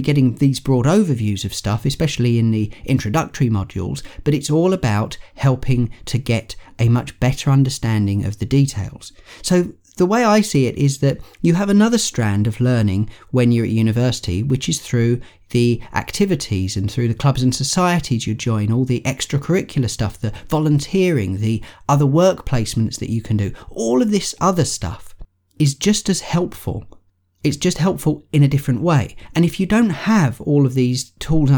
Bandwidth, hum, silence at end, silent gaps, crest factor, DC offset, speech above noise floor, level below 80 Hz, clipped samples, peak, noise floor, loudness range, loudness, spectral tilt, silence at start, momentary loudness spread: 19.5 kHz; none; 0 s; none; 14 dB; under 0.1%; 22 dB; -38 dBFS; under 0.1%; -2 dBFS; -39 dBFS; 3 LU; -18 LUFS; -6 dB/octave; 0 s; 8 LU